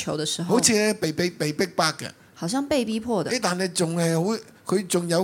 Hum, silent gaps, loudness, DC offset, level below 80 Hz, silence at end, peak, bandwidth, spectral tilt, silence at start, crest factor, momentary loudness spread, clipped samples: none; none; -24 LUFS; under 0.1%; -62 dBFS; 0 s; -4 dBFS; 17 kHz; -4 dB/octave; 0 s; 20 dB; 8 LU; under 0.1%